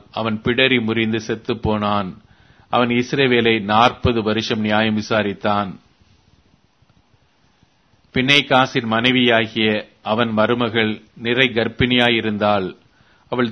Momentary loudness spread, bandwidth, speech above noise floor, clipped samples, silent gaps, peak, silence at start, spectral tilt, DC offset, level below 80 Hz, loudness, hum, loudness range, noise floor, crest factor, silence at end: 9 LU; 9.4 kHz; 41 dB; under 0.1%; none; 0 dBFS; 0.15 s; -5.5 dB/octave; under 0.1%; -46 dBFS; -18 LUFS; none; 5 LU; -58 dBFS; 20 dB; 0 s